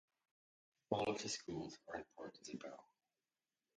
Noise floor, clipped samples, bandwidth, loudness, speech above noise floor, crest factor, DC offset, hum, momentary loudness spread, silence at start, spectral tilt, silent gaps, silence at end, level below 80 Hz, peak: under -90 dBFS; under 0.1%; 9.6 kHz; -46 LUFS; over 44 dB; 28 dB; under 0.1%; none; 14 LU; 0.9 s; -3.5 dB/octave; none; 0.95 s; -76 dBFS; -22 dBFS